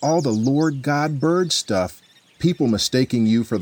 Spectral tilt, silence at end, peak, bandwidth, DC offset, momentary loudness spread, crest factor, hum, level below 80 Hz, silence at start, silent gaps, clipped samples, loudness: -5 dB/octave; 0 s; -6 dBFS; over 20 kHz; under 0.1%; 5 LU; 14 dB; none; -54 dBFS; 0 s; none; under 0.1%; -20 LUFS